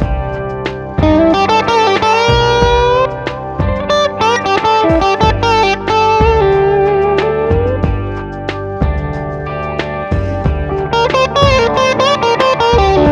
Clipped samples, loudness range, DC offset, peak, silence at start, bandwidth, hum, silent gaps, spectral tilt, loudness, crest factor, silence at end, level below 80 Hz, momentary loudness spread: under 0.1%; 6 LU; under 0.1%; 0 dBFS; 0 s; 10.5 kHz; none; none; -5.5 dB/octave; -12 LUFS; 12 dB; 0 s; -24 dBFS; 10 LU